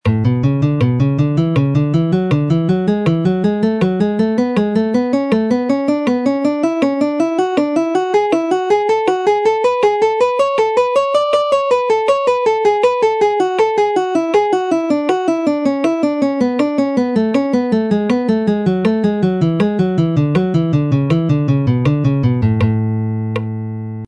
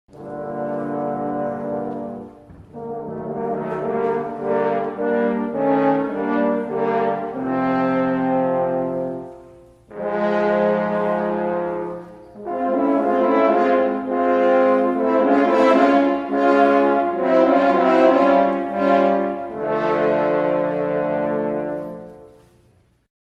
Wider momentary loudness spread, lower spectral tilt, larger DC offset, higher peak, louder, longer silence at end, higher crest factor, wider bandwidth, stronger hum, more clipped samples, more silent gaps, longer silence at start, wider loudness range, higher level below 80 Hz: second, 2 LU vs 14 LU; about the same, -8 dB/octave vs -8 dB/octave; neither; about the same, -2 dBFS vs -2 dBFS; first, -15 LUFS vs -19 LUFS; second, 0 s vs 1 s; second, 12 dB vs 18 dB; first, 10.5 kHz vs 7.6 kHz; neither; neither; neither; about the same, 0.05 s vs 0.15 s; second, 2 LU vs 9 LU; first, -46 dBFS vs -58 dBFS